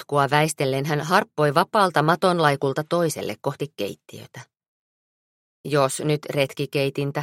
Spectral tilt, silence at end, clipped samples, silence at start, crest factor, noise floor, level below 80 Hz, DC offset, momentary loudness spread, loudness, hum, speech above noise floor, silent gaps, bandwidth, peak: -5 dB/octave; 0 s; under 0.1%; 0 s; 22 dB; under -90 dBFS; -66 dBFS; under 0.1%; 12 LU; -22 LUFS; none; over 68 dB; 4.68-5.64 s; 16.5 kHz; -2 dBFS